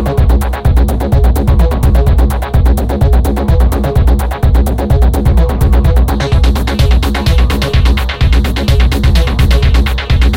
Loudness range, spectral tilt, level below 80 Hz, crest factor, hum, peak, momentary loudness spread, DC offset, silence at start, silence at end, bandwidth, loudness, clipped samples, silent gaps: 0 LU; -6.5 dB/octave; -10 dBFS; 8 dB; none; 0 dBFS; 2 LU; under 0.1%; 0 s; 0 s; 16.5 kHz; -11 LUFS; under 0.1%; none